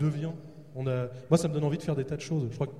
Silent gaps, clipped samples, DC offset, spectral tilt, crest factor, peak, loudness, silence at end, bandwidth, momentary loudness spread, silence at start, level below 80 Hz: none; under 0.1%; 0.2%; -7 dB/octave; 20 dB; -10 dBFS; -31 LUFS; 0 s; 12.5 kHz; 11 LU; 0 s; -60 dBFS